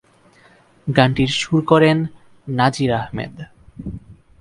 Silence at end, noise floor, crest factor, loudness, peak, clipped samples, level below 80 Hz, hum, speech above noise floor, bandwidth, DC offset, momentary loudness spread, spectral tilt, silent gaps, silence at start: 0.3 s; -52 dBFS; 20 dB; -18 LUFS; 0 dBFS; under 0.1%; -46 dBFS; none; 35 dB; 11.5 kHz; under 0.1%; 23 LU; -6 dB/octave; none; 0.85 s